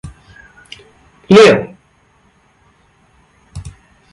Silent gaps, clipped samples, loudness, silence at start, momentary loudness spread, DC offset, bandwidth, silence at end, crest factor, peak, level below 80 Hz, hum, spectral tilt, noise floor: none; under 0.1%; -8 LUFS; 0.05 s; 30 LU; under 0.1%; 11.5 kHz; 0.45 s; 16 dB; 0 dBFS; -44 dBFS; none; -5.5 dB/octave; -53 dBFS